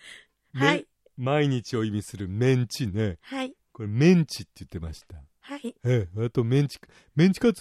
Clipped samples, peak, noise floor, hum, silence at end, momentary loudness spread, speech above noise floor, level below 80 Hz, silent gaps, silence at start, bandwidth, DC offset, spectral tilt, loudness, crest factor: under 0.1%; -6 dBFS; -50 dBFS; none; 0 s; 17 LU; 25 dB; -56 dBFS; none; 0.05 s; 14 kHz; under 0.1%; -6.5 dB/octave; -25 LUFS; 18 dB